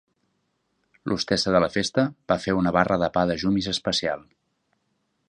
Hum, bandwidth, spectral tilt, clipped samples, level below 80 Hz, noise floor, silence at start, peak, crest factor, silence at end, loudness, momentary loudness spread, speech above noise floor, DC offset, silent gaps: none; 10 kHz; -5 dB/octave; under 0.1%; -50 dBFS; -73 dBFS; 1.05 s; -2 dBFS; 22 dB; 1.1 s; -23 LUFS; 8 LU; 50 dB; under 0.1%; none